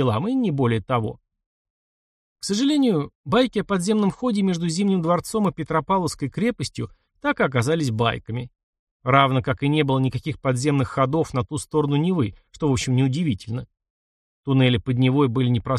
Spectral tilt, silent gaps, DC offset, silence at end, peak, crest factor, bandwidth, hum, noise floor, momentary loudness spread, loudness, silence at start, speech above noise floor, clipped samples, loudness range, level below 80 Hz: -6 dB/octave; 1.46-2.36 s, 3.15-3.24 s, 8.63-8.73 s, 8.79-9.00 s, 13.90-14.43 s; under 0.1%; 0 s; -2 dBFS; 20 dB; 12.5 kHz; none; under -90 dBFS; 10 LU; -22 LUFS; 0 s; over 69 dB; under 0.1%; 2 LU; -50 dBFS